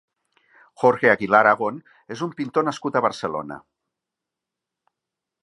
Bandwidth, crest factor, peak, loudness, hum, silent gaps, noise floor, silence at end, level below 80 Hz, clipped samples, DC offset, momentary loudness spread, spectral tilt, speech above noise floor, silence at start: 11 kHz; 22 dB; -2 dBFS; -21 LUFS; none; none; -85 dBFS; 1.85 s; -68 dBFS; under 0.1%; under 0.1%; 21 LU; -5.5 dB/octave; 64 dB; 0.8 s